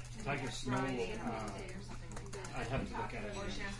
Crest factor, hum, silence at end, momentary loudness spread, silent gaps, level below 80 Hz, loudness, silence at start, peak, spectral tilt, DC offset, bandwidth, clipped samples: 16 dB; none; 0 s; 10 LU; none; -50 dBFS; -41 LUFS; 0 s; -24 dBFS; -5 dB/octave; under 0.1%; 11.5 kHz; under 0.1%